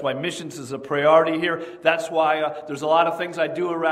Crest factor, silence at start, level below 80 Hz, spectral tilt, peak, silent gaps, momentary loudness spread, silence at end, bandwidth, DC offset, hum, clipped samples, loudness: 20 dB; 0 s; -70 dBFS; -4.5 dB/octave; -2 dBFS; none; 11 LU; 0 s; 14 kHz; under 0.1%; none; under 0.1%; -21 LUFS